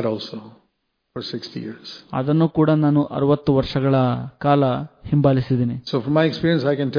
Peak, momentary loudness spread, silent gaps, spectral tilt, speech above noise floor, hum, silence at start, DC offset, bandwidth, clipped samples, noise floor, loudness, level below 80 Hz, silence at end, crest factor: -4 dBFS; 15 LU; none; -9 dB/octave; 52 dB; none; 0 s; under 0.1%; 5.2 kHz; under 0.1%; -71 dBFS; -20 LUFS; -48 dBFS; 0 s; 16 dB